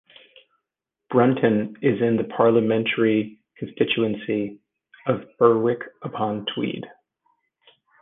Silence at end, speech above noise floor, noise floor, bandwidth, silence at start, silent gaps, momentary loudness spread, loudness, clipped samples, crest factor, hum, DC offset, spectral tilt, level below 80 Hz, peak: 1.15 s; 63 dB; -84 dBFS; 3.9 kHz; 1.1 s; none; 15 LU; -22 LUFS; under 0.1%; 20 dB; none; under 0.1%; -9.5 dB/octave; -66 dBFS; -2 dBFS